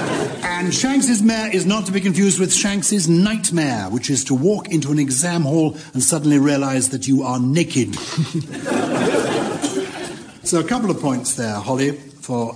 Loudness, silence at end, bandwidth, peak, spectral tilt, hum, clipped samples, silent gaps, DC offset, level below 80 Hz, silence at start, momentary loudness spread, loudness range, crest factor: -18 LUFS; 0 s; 10.5 kHz; -2 dBFS; -4.5 dB/octave; none; under 0.1%; none; under 0.1%; -54 dBFS; 0 s; 7 LU; 4 LU; 16 dB